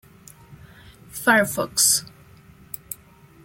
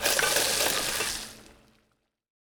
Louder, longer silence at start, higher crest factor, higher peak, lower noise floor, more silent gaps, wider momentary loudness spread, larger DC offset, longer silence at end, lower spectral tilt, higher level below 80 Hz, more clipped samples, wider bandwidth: first, -19 LUFS vs -25 LUFS; first, 0.5 s vs 0 s; about the same, 22 dB vs 22 dB; first, -4 dBFS vs -8 dBFS; second, -51 dBFS vs -73 dBFS; neither; first, 20 LU vs 12 LU; neither; second, 0.5 s vs 1.05 s; first, -1.5 dB/octave vs 0 dB/octave; about the same, -58 dBFS vs -54 dBFS; neither; second, 17 kHz vs over 20 kHz